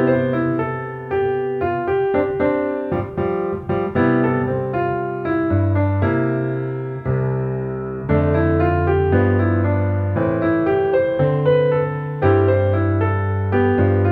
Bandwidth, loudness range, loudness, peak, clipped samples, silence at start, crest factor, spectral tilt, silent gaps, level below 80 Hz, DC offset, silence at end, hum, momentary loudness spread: 4.3 kHz; 3 LU; -19 LUFS; -2 dBFS; under 0.1%; 0 s; 16 dB; -11 dB/octave; none; -44 dBFS; under 0.1%; 0 s; none; 7 LU